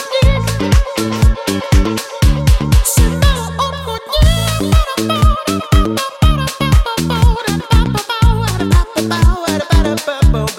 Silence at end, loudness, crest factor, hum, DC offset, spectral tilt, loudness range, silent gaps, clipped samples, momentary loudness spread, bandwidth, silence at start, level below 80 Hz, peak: 0 s; -14 LUFS; 12 dB; none; under 0.1%; -5 dB/octave; 1 LU; none; under 0.1%; 5 LU; 16.5 kHz; 0 s; -16 dBFS; 0 dBFS